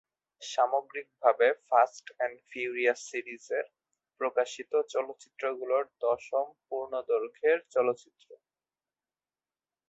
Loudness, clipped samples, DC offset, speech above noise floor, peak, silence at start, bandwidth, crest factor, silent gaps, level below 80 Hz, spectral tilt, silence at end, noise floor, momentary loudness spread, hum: -30 LUFS; under 0.1%; under 0.1%; over 60 dB; -10 dBFS; 0.4 s; 8.2 kHz; 22 dB; none; -80 dBFS; -2.5 dB/octave; 1.55 s; under -90 dBFS; 11 LU; none